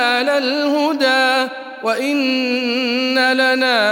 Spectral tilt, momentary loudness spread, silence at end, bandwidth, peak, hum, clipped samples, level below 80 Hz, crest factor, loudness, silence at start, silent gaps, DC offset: -2 dB/octave; 5 LU; 0 s; 17 kHz; -2 dBFS; none; under 0.1%; -74 dBFS; 14 dB; -16 LUFS; 0 s; none; under 0.1%